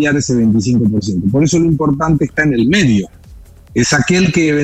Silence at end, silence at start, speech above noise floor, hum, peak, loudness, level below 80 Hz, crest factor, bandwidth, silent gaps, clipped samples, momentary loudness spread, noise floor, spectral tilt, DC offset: 0 s; 0 s; 25 dB; none; -2 dBFS; -13 LUFS; -36 dBFS; 12 dB; 11.5 kHz; none; under 0.1%; 5 LU; -38 dBFS; -5.5 dB/octave; under 0.1%